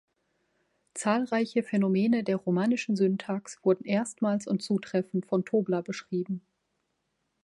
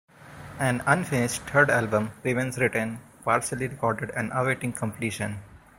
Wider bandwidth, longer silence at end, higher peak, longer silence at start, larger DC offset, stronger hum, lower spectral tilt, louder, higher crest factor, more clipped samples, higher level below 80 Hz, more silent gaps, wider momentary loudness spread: second, 11.5 kHz vs 16 kHz; first, 1.05 s vs 0.2 s; second, -12 dBFS vs -4 dBFS; first, 0.95 s vs 0.2 s; neither; neither; first, -6.5 dB/octave vs -5 dB/octave; about the same, -28 LUFS vs -26 LUFS; about the same, 18 dB vs 22 dB; neither; second, -74 dBFS vs -56 dBFS; neither; second, 7 LU vs 12 LU